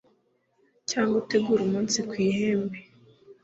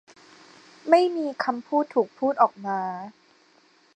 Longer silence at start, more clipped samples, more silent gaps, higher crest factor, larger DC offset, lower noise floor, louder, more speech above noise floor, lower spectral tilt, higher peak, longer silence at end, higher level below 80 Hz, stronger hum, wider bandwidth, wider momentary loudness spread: about the same, 0.9 s vs 0.85 s; neither; neither; second, 16 dB vs 22 dB; neither; first, -69 dBFS vs -60 dBFS; about the same, -26 LUFS vs -24 LUFS; first, 44 dB vs 36 dB; second, -4.5 dB/octave vs -6 dB/octave; second, -10 dBFS vs -4 dBFS; second, 0.1 s vs 0.85 s; first, -66 dBFS vs -84 dBFS; neither; second, 8 kHz vs 9.2 kHz; second, 10 LU vs 15 LU